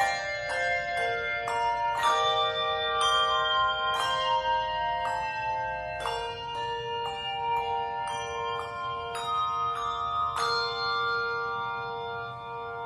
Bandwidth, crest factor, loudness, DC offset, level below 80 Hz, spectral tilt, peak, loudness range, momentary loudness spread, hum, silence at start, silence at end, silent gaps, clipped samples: 13.5 kHz; 16 dB; -29 LUFS; under 0.1%; -56 dBFS; -2 dB/octave; -14 dBFS; 6 LU; 9 LU; none; 0 s; 0 s; none; under 0.1%